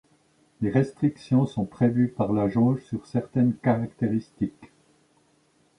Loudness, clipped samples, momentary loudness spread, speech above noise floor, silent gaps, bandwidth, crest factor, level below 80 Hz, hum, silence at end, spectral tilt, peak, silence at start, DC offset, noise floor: -25 LUFS; under 0.1%; 8 LU; 40 dB; none; 10 kHz; 18 dB; -58 dBFS; none; 1.15 s; -9.5 dB/octave; -8 dBFS; 0.6 s; under 0.1%; -64 dBFS